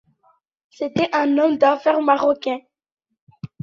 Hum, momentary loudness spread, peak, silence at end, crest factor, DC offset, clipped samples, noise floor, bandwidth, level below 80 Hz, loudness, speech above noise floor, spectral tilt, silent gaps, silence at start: none; 14 LU; -2 dBFS; 0.15 s; 18 dB; under 0.1%; under 0.1%; -62 dBFS; 7.2 kHz; -62 dBFS; -19 LUFS; 44 dB; -6.5 dB/octave; 2.92-2.97 s, 3.21-3.27 s; 0.8 s